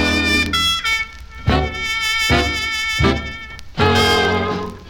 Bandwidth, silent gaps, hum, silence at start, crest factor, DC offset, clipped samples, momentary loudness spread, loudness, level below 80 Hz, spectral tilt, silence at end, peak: 19 kHz; none; none; 0 s; 16 dB; under 0.1%; under 0.1%; 10 LU; -17 LUFS; -30 dBFS; -4 dB/octave; 0 s; -2 dBFS